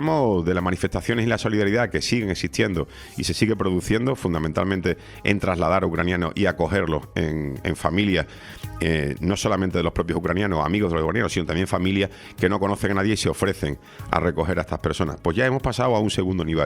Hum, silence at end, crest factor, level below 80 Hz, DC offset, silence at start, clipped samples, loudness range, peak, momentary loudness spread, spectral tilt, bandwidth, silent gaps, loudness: none; 0 s; 20 dB; -42 dBFS; under 0.1%; 0 s; under 0.1%; 1 LU; -2 dBFS; 5 LU; -5.5 dB/octave; 16.5 kHz; none; -23 LUFS